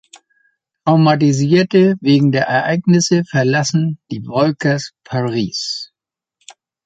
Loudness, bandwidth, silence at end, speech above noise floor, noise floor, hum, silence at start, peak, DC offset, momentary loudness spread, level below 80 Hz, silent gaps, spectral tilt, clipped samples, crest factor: -15 LUFS; 9 kHz; 1 s; 70 dB; -84 dBFS; none; 0.85 s; -2 dBFS; under 0.1%; 10 LU; -56 dBFS; none; -5.5 dB/octave; under 0.1%; 14 dB